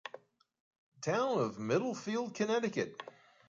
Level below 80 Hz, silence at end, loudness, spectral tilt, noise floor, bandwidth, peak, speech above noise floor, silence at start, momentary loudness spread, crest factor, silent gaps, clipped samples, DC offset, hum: -80 dBFS; 0.4 s; -35 LUFS; -5 dB/octave; -56 dBFS; 7.6 kHz; -18 dBFS; 22 dB; 0.05 s; 14 LU; 18 dB; 0.60-0.71 s, 0.78-0.92 s; under 0.1%; under 0.1%; none